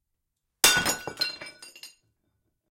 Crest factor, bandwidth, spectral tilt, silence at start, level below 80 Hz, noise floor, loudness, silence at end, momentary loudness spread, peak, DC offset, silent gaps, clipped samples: 26 dB; 16.5 kHz; 0 dB/octave; 0.65 s; -60 dBFS; -81 dBFS; -23 LUFS; 0.9 s; 24 LU; -4 dBFS; under 0.1%; none; under 0.1%